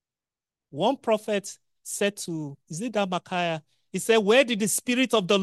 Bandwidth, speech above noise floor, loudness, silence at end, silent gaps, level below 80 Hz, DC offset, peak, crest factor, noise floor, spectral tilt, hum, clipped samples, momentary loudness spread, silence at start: 12.5 kHz; over 65 dB; -25 LUFS; 0 s; none; -74 dBFS; under 0.1%; -6 dBFS; 20 dB; under -90 dBFS; -3.5 dB/octave; none; under 0.1%; 15 LU; 0.75 s